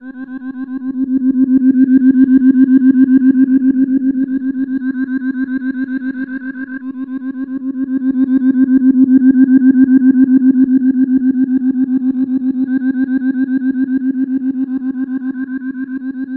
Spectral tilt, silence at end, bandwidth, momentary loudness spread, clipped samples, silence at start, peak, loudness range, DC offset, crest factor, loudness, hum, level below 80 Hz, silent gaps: -11 dB/octave; 0 s; 1.8 kHz; 13 LU; under 0.1%; 0 s; 0 dBFS; 9 LU; under 0.1%; 12 dB; -13 LUFS; none; -58 dBFS; none